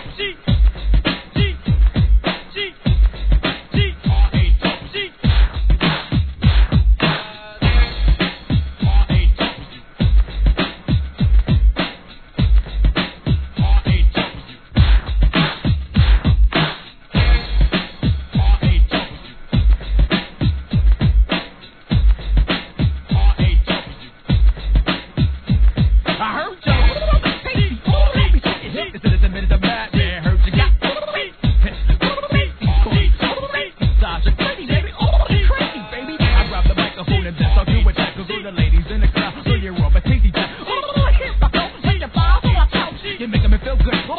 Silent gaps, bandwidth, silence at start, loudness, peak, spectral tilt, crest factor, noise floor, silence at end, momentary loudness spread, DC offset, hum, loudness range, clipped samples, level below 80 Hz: none; 4.5 kHz; 0 s; -18 LUFS; 0 dBFS; -9.5 dB/octave; 14 dB; -37 dBFS; 0 s; 7 LU; 0.3%; none; 2 LU; under 0.1%; -16 dBFS